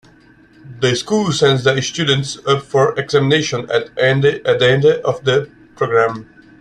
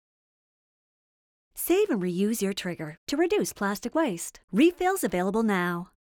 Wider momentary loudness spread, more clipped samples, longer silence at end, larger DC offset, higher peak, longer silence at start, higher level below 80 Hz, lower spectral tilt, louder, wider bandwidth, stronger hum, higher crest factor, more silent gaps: second, 6 LU vs 10 LU; neither; about the same, 0.35 s vs 0.25 s; neither; first, -2 dBFS vs -10 dBFS; second, 0.65 s vs 1.55 s; first, -52 dBFS vs -60 dBFS; about the same, -5 dB/octave vs -5 dB/octave; first, -15 LUFS vs -27 LUFS; second, 10.5 kHz vs 19.5 kHz; neither; about the same, 14 dB vs 18 dB; second, none vs 2.98-3.07 s, 4.44-4.48 s